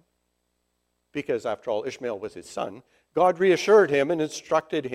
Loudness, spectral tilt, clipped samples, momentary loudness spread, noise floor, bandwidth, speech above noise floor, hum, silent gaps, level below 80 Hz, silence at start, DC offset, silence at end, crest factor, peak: -24 LUFS; -5 dB/octave; under 0.1%; 17 LU; -75 dBFS; 12.5 kHz; 51 dB; 60 Hz at -60 dBFS; none; -68 dBFS; 1.15 s; under 0.1%; 0 s; 18 dB; -6 dBFS